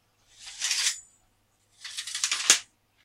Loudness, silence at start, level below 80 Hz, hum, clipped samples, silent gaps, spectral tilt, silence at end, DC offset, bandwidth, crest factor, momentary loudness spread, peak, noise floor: -25 LUFS; 0.4 s; -74 dBFS; none; under 0.1%; none; 3.5 dB/octave; 0.4 s; under 0.1%; 16 kHz; 30 dB; 22 LU; -2 dBFS; -68 dBFS